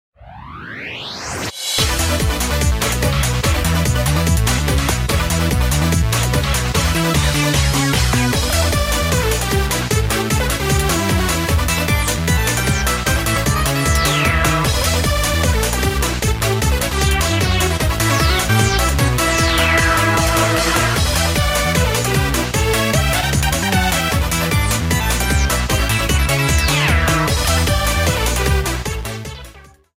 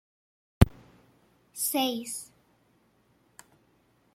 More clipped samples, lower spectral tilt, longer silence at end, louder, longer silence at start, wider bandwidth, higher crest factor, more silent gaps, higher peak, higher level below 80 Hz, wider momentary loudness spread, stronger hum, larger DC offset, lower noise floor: neither; about the same, -4 dB/octave vs -5 dB/octave; second, 0.35 s vs 1.9 s; first, -16 LUFS vs -28 LUFS; second, 0.2 s vs 0.6 s; about the same, 16.5 kHz vs 16.5 kHz; second, 16 dB vs 30 dB; neither; about the same, 0 dBFS vs -2 dBFS; first, -22 dBFS vs -42 dBFS; second, 3 LU vs 18 LU; neither; neither; second, -41 dBFS vs -67 dBFS